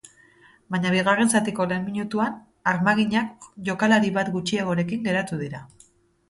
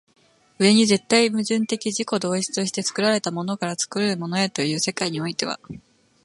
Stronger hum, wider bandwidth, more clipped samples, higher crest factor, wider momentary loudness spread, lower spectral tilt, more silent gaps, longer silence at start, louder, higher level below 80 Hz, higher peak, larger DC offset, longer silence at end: neither; about the same, 11.5 kHz vs 11.5 kHz; neither; about the same, 20 dB vs 20 dB; about the same, 11 LU vs 9 LU; first, -5 dB/octave vs -3.5 dB/octave; neither; about the same, 0.7 s vs 0.6 s; about the same, -23 LUFS vs -22 LUFS; about the same, -62 dBFS vs -66 dBFS; about the same, -6 dBFS vs -4 dBFS; neither; first, 0.65 s vs 0.45 s